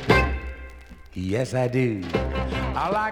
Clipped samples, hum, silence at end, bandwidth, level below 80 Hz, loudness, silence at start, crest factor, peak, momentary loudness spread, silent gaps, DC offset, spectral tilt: under 0.1%; none; 0 s; 16 kHz; -34 dBFS; -25 LUFS; 0 s; 20 dB; -4 dBFS; 17 LU; none; under 0.1%; -6.5 dB/octave